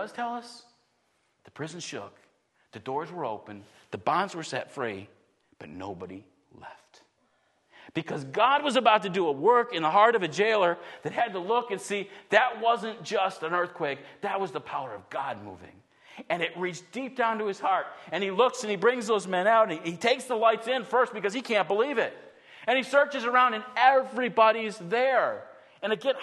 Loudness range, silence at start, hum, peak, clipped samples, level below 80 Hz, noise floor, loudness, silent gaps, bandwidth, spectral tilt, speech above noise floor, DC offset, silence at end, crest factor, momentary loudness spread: 14 LU; 0 s; none; -4 dBFS; under 0.1%; -78 dBFS; -72 dBFS; -27 LUFS; none; 12 kHz; -4 dB/octave; 44 dB; under 0.1%; 0 s; 24 dB; 16 LU